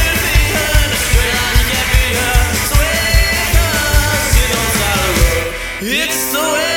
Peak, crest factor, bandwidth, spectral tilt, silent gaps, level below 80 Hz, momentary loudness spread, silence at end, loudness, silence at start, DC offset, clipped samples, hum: 0 dBFS; 12 dB; 17.5 kHz; -3 dB/octave; none; -16 dBFS; 2 LU; 0 s; -13 LUFS; 0 s; under 0.1%; under 0.1%; none